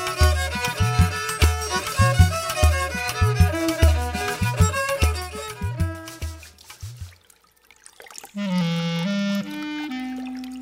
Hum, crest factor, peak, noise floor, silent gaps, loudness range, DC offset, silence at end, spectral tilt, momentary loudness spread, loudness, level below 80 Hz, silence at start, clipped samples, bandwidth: none; 20 dB; -4 dBFS; -57 dBFS; none; 10 LU; under 0.1%; 0 s; -5 dB/octave; 17 LU; -23 LUFS; -28 dBFS; 0 s; under 0.1%; 16 kHz